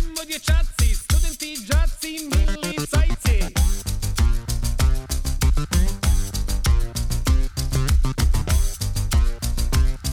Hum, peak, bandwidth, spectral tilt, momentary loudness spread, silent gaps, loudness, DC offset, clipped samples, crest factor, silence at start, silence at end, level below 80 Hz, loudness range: none; -8 dBFS; 19 kHz; -4.5 dB/octave; 5 LU; none; -23 LUFS; under 0.1%; under 0.1%; 12 dB; 0 s; 0 s; -20 dBFS; 1 LU